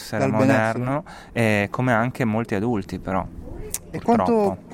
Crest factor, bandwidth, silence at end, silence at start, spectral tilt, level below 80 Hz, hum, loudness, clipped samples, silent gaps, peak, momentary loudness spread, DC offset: 20 dB; 17 kHz; 0 s; 0 s; -6.5 dB/octave; -44 dBFS; none; -22 LUFS; under 0.1%; none; -2 dBFS; 12 LU; under 0.1%